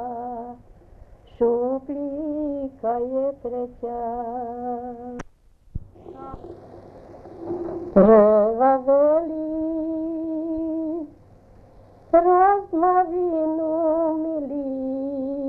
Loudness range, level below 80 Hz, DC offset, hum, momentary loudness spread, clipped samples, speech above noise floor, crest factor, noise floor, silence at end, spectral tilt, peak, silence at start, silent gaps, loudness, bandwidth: 14 LU; -48 dBFS; under 0.1%; none; 22 LU; under 0.1%; 31 dB; 20 dB; -51 dBFS; 0 s; -10 dB/octave; -4 dBFS; 0 s; none; -22 LUFS; 6.2 kHz